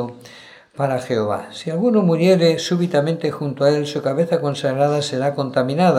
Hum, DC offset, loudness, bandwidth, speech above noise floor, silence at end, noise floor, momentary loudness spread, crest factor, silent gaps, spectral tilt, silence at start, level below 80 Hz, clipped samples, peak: none; under 0.1%; -19 LUFS; 13 kHz; 25 dB; 0 s; -43 dBFS; 9 LU; 16 dB; none; -6.5 dB/octave; 0 s; -68 dBFS; under 0.1%; -2 dBFS